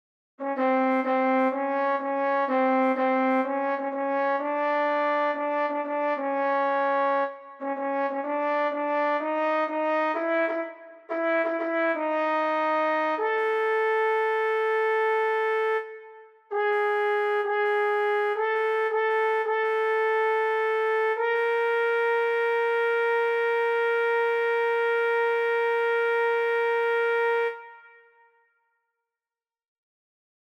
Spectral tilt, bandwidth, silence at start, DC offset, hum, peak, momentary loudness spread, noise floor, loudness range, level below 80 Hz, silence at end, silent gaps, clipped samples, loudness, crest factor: -4 dB/octave; 6.6 kHz; 0.4 s; under 0.1%; none; -14 dBFS; 4 LU; under -90 dBFS; 2 LU; -86 dBFS; 2.75 s; none; under 0.1%; -25 LUFS; 10 dB